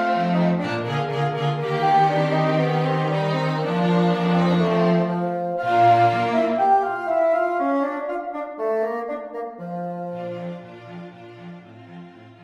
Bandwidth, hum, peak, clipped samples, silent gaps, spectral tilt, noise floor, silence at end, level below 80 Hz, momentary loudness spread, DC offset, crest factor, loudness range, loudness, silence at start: 8.2 kHz; none; -6 dBFS; under 0.1%; none; -8 dB/octave; -42 dBFS; 0.1 s; -64 dBFS; 20 LU; under 0.1%; 16 dB; 10 LU; -21 LUFS; 0 s